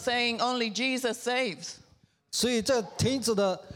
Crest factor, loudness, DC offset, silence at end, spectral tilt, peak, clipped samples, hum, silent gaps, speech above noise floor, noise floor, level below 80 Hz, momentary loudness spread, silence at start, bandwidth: 14 dB; -28 LUFS; under 0.1%; 0 s; -3.5 dB/octave; -14 dBFS; under 0.1%; none; none; 34 dB; -62 dBFS; -62 dBFS; 8 LU; 0 s; 18 kHz